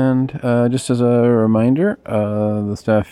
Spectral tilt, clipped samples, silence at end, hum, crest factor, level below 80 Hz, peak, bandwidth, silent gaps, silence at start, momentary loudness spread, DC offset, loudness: -7.5 dB/octave; under 0.1%; 0.05 s; none; 12 dB; -52 dBFS; -4 dBFS; 12 kHz; none; 0 s; 6 LU; under 0.1%; -17 LUFS